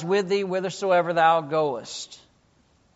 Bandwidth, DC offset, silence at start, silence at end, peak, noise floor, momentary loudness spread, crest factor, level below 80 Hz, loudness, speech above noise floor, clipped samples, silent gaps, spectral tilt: 8 kHz; under 0.1%; 0 s; 0.8 s; -6 dBFS; -62 dBFS; 15 LU; 18 dB; -70 dBFS; -23 LUFS; 39 dB; under 0.1%; none; -3.5 dB/octave